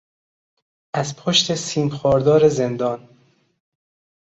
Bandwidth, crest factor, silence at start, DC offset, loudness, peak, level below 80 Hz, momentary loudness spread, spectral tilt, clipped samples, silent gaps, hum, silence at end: 8.2 kHz; 18 dB; 0.95 s; under 0.1%; -19 LUFS; -2 dBFS; -54 dBFS; 10 LU; -4.5 dB/octave; under 0.1%; none; none; 1.3 s